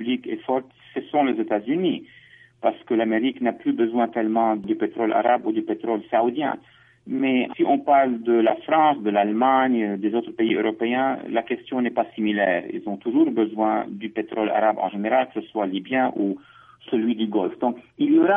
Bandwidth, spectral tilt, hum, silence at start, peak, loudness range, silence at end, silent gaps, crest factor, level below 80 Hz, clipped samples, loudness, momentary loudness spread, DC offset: 3.7 kHz; -9 dB/octave; none; 0 s; -6 dBFS; 4 LU; 0 s; none; 16 dB; -72 dBFS; under 0.1%; -23 LUFS; 8 LU; under 0.1%